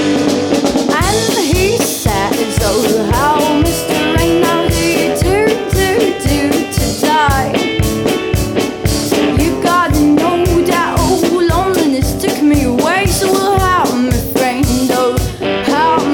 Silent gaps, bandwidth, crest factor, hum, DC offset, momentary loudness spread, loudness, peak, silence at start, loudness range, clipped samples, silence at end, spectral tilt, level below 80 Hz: none; 18.5 kHz; 12 dB; none; under 0.1%; 3 LU; -13 LUFS; 0 dBFS; 0 s; 1 LU; under 0.1%; 0 s; -4.5 dB/octave; -26 dBFS